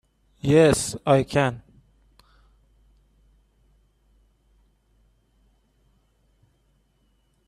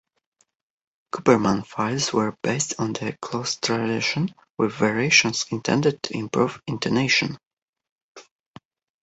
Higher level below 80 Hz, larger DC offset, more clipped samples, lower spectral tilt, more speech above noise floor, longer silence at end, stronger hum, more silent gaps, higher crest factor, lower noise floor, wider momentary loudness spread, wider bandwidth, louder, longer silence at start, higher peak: first, -54 dBFS vs -60 dBFS; neither; neither; first, -5.5 dB/octave vs -4 dB/octave; about the same, 46 dB vs 46 dB; first, 5.9 s vs 0.8 s; neither; second, none vs 4.50-4.55 s, 7.47-7.57 s, 7.69-7.73 s, 7.91-7.96 s, 8.02-8.15 s; about the same, 22 dB vs 22 dB; about the same, -66 dBFS vs -69 dBFS; about the same, 12 LU vs 11 LU; first, 14 kHz vs 8.4 kHz; about the same, -21 LUFS vs -22 LUFS; second, 0.45 s vs 1.15 s; about the same, -4 dBFS vs -2 dBFS